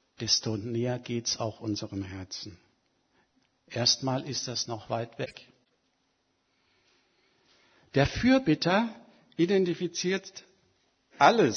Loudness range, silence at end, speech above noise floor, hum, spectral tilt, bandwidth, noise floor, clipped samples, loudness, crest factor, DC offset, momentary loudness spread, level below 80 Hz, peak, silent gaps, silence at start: 9 LU; 0 s; 46 dB; none; -4 dB/octave; 6.6 kHz; -74 dBFS; under 0.1%; -28 LUFS; 26 dB; under 0.1%; 15 LU; -56 dBFS; -6 dBFS; none; 0.2 s